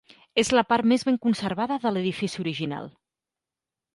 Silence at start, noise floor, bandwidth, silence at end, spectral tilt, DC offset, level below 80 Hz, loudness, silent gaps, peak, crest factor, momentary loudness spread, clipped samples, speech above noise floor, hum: 0.35 s; -89 dBFS; 11.5 kHz; 1.05 s; -5 dB/octave; under 0.1%; -62 dBFS; -25 LUFS; none; -8 dBFS; 18 dB; 10 LU; under 0.1%; 65 dB; none